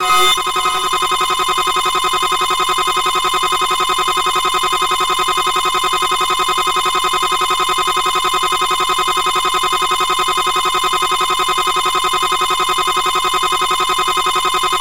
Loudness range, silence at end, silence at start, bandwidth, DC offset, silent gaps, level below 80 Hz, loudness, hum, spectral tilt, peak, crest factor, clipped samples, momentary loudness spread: 0 LU; 0 s; 0 s; 16.5 kHz; 2%; none; -44 dBFS; -14 LUFS; none; -0.5 dB/octave; -2 dBFS; 14 dB; under 0.1%; 0 LU